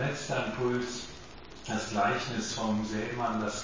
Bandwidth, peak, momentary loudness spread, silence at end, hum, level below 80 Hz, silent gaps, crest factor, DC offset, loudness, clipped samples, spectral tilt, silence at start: 7.6 kHz; -16 dBFS; 14 LU; 0 s; none; -56 dBFS; none; 16 dB; 0.3%; -32 LUFS; under 0.1%; -4.5 dB/octave; 0 s